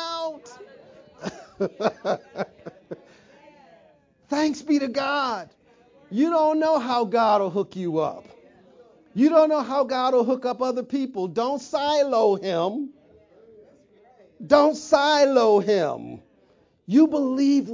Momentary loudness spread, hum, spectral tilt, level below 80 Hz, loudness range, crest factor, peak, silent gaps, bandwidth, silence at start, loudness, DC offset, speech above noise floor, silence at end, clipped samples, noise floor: 17 LU; none; -5 dB/octave; -68 dBFS; 9 LU; 20 dB; -4 dBFS; none; 7.6 kHz; 0 s; -22 LUFS; under 0.1%; 39 dB; 0 s; under 0.1%; -60 dBFS